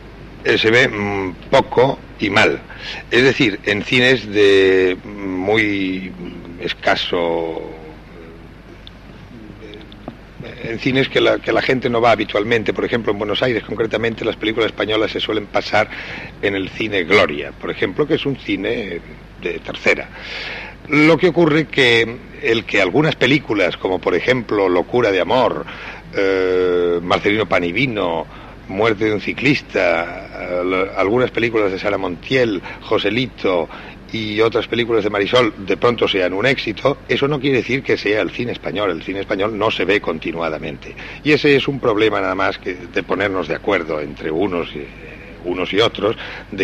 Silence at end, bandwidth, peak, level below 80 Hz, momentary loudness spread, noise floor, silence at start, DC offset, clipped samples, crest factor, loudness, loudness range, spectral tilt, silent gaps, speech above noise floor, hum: 0 s; 11 kHz; -2 dBFS; -44 dBFS; 14 LU; -38 dBFS; 0 s; under 0.1%; under 0.1%; 16 dB; -17 LUFS; 6 LU; -5.5 dB/octave; none; 21 dB; none